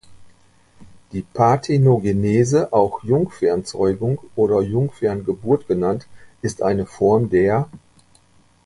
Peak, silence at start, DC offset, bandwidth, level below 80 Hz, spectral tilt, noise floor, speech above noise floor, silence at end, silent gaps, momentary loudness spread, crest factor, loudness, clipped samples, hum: -2 dBFS; 0.1 s; under 0.1%; 11.5 kHz; -46 dBFS; -7.5 dB/octave; -54 dBFS; 36 dB; 0.9 s; none; 10 LU; 18 dB; -19 LUFS; under 0.1%; none